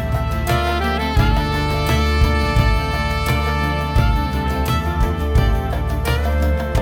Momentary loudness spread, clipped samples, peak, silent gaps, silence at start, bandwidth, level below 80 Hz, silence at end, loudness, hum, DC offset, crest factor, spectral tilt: 4 LU; under 0.1%; -2 dBFS; none; 0 s; 18 kHz; -20 dBFS; 0 s; -19 LUFS; none; under 0.1%; 14 dB; -6 dB/octave